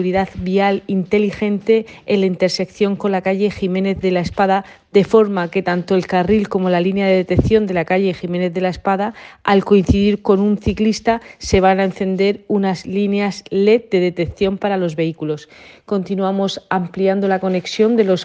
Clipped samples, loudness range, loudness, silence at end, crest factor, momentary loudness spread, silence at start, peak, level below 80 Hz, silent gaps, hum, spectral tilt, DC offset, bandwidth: under 0.1%; 3 LU; -17 LUFS; 0 s; 16 dB; 6 LU; 0 s; 0 dBFS; -40 dBFS; none; none; -6.5 dB/octave; under 0.1%; 8.4 kHz